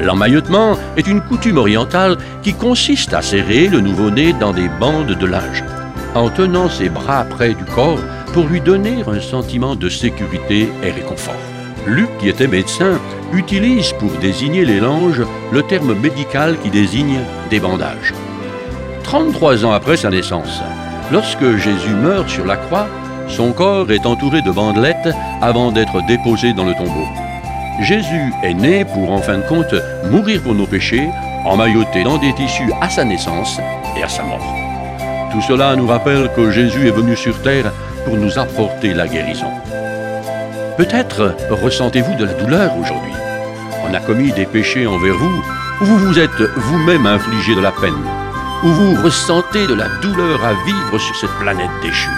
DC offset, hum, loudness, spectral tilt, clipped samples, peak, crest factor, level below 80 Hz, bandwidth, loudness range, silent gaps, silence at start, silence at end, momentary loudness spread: under 0.1%; none; -15 LUFS; -5.5 dB/octave; under 0.1%; 0 dBFS; 14 dB; -34 dBFS; 15.5 kHz; 4 LU; none; 0 s; 0 s; 9 LU